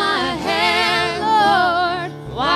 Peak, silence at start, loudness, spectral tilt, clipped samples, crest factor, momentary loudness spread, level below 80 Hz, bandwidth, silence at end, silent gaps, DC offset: -2 dBFS; 0 s; -17 LUFS; -3.5 dB/octave; under 0.1%; 16 dB; 8 LU; -46 dBFS; 13 kHz; 0 s; none; under 0.1%